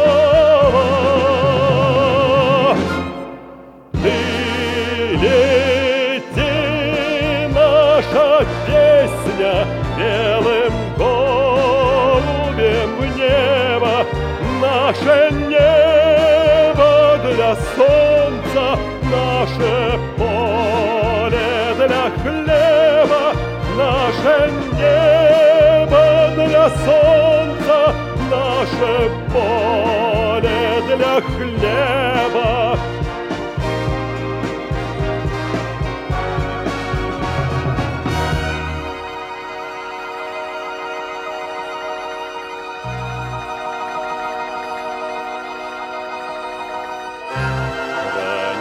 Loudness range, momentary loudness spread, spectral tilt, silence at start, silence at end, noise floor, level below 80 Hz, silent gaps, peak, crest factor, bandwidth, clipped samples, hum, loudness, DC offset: 13 LU; 15 LU; -6 dB/octave; 0 s; 0 s; -38 dBFS; -32 dBFS; none; -2 dBFS; 14 dB; 13.5 kHz; under 0.1%; none; -16 LUFS; under 0.1%